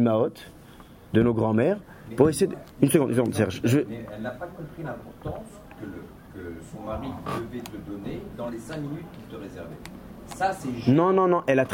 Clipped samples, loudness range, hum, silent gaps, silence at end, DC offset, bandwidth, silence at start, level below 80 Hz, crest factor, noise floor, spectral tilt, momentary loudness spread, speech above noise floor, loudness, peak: under 0.1%; 13 LU; none; none; 0 s; under 0.1%; 16.5 kHz; 0 s; -52 dBFS; 22 dB; -48 dBFS; -6.5 dB/octave; 19 LU; 22 dB; -26 LUFS; -4 dBFS